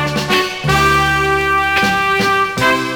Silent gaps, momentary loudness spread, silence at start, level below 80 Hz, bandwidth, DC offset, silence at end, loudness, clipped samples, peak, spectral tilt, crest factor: none; 3 LU; 0 s; -34 dBFS; over 20 kHz; under 0.1%; 0 s; -13 LUFS; under 0.1%; -2 dBFS; -4 dB/octave; 12 dB